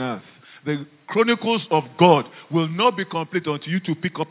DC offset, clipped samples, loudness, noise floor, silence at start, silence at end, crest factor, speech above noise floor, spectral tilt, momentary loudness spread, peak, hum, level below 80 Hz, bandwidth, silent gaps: under 0.1%; under 0.1%; -21 LUFS; -41 dBFS; 0 s; 0.05 s; 20 dB; 20 dB; -10 dB/octave; 13 LU; -2 dBFS; none; -72 dBFS; 4 kHz; none